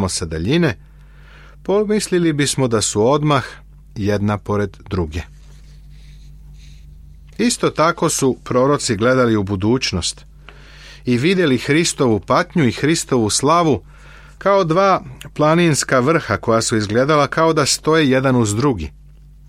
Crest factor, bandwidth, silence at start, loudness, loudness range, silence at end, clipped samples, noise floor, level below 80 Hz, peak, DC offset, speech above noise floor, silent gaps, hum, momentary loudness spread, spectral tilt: 16 dB; 16 kHz; 0 s; -16 LUFS; 7 LU; 0.6 s; under 0.1%; -42 dBFS; -40 dBFS; -2 dBFS; under 0.1%; 26 dB; none; none; 9 LU; -4.5 dB/octave